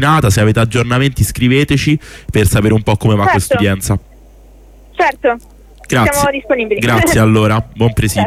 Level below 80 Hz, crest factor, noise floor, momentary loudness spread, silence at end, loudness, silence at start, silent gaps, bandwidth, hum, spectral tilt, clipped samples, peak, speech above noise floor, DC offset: -30 dBFS; 12 dB; -39 dBFS; 7 LU; 0 s; -13 LUFS; 0 s; none; 15.5 kHz; 50 Hz at -35 dBFS; -5.5 dB/octave; under 0.1%; 0 dBFS; 28 dB; under 0.1%